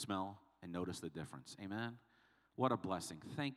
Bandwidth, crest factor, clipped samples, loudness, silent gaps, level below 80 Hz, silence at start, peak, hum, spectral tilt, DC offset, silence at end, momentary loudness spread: 14.5 kHz; 24 dB; under 0.1%; -44 LUFS; none; -78 dBFS; 0 s; -20 dBFS; none; -5 dB/octave; under 0.1%; 0 s; 14 LU